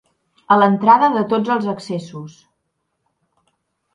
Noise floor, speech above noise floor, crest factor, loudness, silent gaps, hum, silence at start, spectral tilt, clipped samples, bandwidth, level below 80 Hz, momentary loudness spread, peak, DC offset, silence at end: -72 dBFS; 57 dB; 18 dB; -16 LUFS; none; none; 0.5 s; -7 dB/octave; under 0.1%; 10.5 kHz; -68 dBFS; 16 LU; 0 dBFS; under 0.1%; 1.65 s